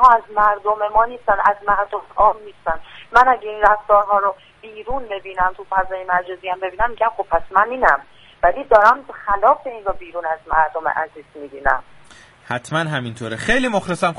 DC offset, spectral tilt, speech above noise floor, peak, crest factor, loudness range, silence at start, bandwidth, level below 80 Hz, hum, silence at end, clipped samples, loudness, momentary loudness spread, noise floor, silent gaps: under 0.1%; -5 dB/octave; 27 dB; 0 dBFS; 18 dB; 6 LU; 0 s; 11.5 kHz; -40 dBFS; none; 0 s; under 0.1%; -18 LUFS; 13 LU; -46 dBFS; none